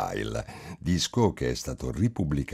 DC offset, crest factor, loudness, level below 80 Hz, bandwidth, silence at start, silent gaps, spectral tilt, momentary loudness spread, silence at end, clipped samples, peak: under 0.1%; 20 dB; -29 LUFS; -44 dBFS; 15.5 kHz; 0 s; none; -5.5 dB/octave; 10 LU; 0 s; under 0.1%; -10 dBFS